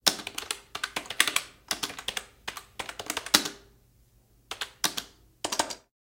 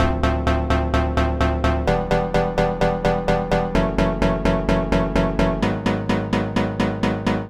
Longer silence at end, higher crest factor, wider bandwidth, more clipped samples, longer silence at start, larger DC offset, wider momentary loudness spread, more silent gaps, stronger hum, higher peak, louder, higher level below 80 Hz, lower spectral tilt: first, 0.25 s vs 0 s; first, 32 dB vs 14 dB; first, 17 kHz vs 11.5 kHz; neither; about the same, 0.05 s vs 0 s; second, under 0.1% vs 0.3%; first, 15 LU vs 2 LU; neither; neither; first, 0 dBFS vs -6 dBFS; second, -30 LUFS vs -21 LUFS; second, -62 dBFS vs -26 dBFS; second, 0 dB/octave vs -7 dB/octave